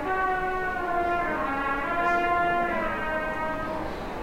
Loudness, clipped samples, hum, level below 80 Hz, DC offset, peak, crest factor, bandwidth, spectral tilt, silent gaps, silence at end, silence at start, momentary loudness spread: -27 LUFS; under 0.1%; none; -44 dBFS; under 0.1%; -14 dBFS; 14 dB; 16.5 kHz; -6 dB/octave; none; 0 s; 0 s; 6 LU